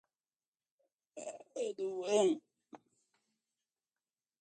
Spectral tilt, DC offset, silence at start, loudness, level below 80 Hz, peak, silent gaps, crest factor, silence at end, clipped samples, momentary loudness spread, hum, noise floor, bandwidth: -4 dB/octave; under 0.1%; 1.15 s; -36 LUFS; under -90 dBFS; -18 dBFS; none; 22 dB; 1.65 s; under 0.1%; 17 LU; none; under -90 dBFS; 9 kHz